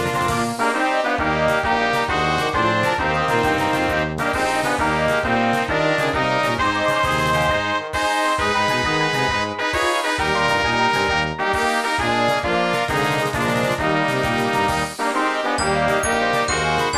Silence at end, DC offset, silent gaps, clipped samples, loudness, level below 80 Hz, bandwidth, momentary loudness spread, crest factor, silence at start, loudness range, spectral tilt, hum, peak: 0 s; 0.3%; none; under 0.1%; -19 LUFS; -40 dBFS; 14 kHz; 2 LU; 16 dB; 0 s; 1 LU; -4 dB/octave; none; -4 dBFS